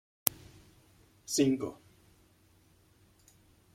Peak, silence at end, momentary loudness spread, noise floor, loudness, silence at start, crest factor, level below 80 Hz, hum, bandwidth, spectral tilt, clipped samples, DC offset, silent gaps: 0 dBFS; 2 s; 23 LU; -65 dBFS; -32 LUFS; 0.25 s; 38 dB; -68 dBFS; none; 16.5 kHz; -4 dB/octave; under 0.1%; under 0.1%; none